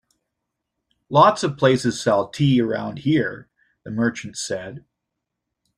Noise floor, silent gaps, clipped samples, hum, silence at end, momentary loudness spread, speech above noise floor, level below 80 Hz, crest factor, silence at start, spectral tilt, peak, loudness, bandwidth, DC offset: -81 dBFS; none; under 0.1%; none; 1 s; 14 LU; 61 dB; -58 dBFS; 20 dB; 1.1 s; -5.5 dB/octave; -2 dBFS; -20 LUFS; 11.5 kHz; under 0.1%